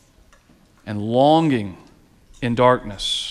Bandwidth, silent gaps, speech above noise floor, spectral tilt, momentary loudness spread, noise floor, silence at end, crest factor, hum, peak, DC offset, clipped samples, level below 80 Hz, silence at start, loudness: 13 kHz; none; 36 dB; -5.5 dB/octave; 16 LU; -54 dBFS; 0 s; 20 dB; none; -2 dBFS; under 0.1%; under 0.1%; -48 dBFS; 0.85 s; -19 LUFS